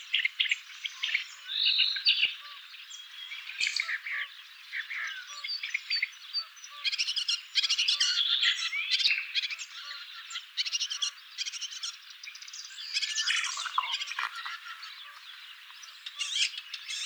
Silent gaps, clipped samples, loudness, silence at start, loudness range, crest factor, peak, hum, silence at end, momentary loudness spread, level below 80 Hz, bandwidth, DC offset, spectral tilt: none; under 0.1%; -29 LUFS; 0 s; 8 LU; 22 dB; -10 dBFS; none; 0 s; 18 LU; under -90 dBFS; over 20 kHz; under 0.1%; 6.5 dB/octave